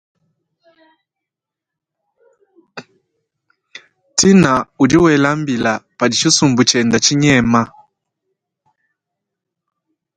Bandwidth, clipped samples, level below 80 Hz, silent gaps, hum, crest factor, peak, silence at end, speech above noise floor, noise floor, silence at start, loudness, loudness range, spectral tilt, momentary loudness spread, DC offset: 10.5 kHz; under 0.1%; -48 dBFS; none; none; 18 dB; 0 dBFS; 2.5 s; 71 dB; -84 dBFS; 2.75 s; -13 LUFS; 5 LU; -4 dB/octave; 7 LU; under 0.1%